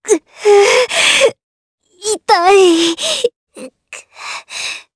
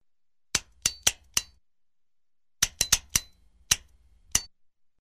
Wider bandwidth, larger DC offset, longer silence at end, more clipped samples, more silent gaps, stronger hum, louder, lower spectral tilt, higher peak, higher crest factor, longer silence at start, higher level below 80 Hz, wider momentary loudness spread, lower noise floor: second, 11 kHz vs 15.5 kHz; neither; second, 0.15 s vs 0.55 s; neither; first, 1.43-1.78 s, 3.36-3.47 s vs none; neither; first, -12 LUFS vs -27 LUFS; first, -1 dB/octave vs 0.5 dB/octave; first, 0 dBFS vs -6 dBFS; second, 14 dB vs 28 dB; second, 0.05 s vs 0.55 s; second, -56 dBFS vs -50 dBFS; first, 18 LU vs 7 LU; second, -37 dBFS vs -87 dBFS